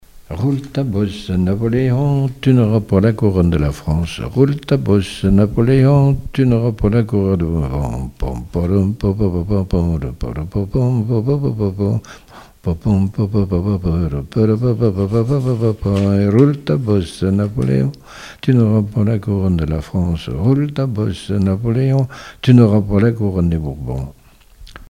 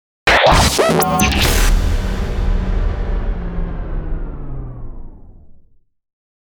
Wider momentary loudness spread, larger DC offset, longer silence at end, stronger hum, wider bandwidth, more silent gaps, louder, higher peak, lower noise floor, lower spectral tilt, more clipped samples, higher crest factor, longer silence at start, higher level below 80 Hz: second, 9 LU vs 19 LU; neither; second, 0.05 s vs 0.9 s; neither; second, 11.5 kHz vs over 20 kHz; neither; about the same, -16 LUFS vs -16 LUFS; about the same, 0 dBFS vs -2 dBFS; second, -42 dBFS vs -48 dBFS; first, -8.5 dB/octave vs -4 dB/octave; neither; about the same, 16 dB vs 16 dB; about the same, 0.15 s vs 0.25 s; second, -32 dBFS vs -20 dBFS